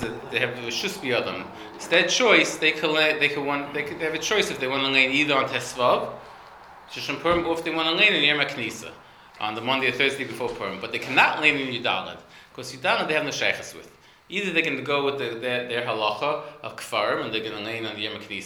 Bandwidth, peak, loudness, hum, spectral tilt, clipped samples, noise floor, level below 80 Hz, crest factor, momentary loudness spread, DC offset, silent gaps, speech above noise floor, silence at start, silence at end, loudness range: 20 kHz; -2 dBFS; -23 LUFS; none; -3 dB/octave; under 0.1%; -46 dBFS; -60 dBFS; 24 dB; 13 LU; under 0.1%; none; 21 dB; 0 s; 0 s; 5 LU